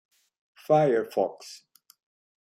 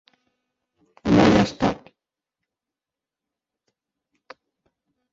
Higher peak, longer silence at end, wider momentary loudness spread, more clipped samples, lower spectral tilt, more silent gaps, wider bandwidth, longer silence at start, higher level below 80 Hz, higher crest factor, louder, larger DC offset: second, -10 dBFS vs -4 dBFS; second, 0.85 s vs 3.4 s; first, 23 LU vs 16 LU; neither; about the same, -6.5 dB/octave vs -6.5 dB/octave; neither; first, 15 kHz vs 7.8 kHz; second, 0.7 s vs 1.05 s; second, -76 dBFS vs -48 dBFS; about the same, 18 dB vs 22 dB; second, -25 LUFS vs -19 LUFS; neither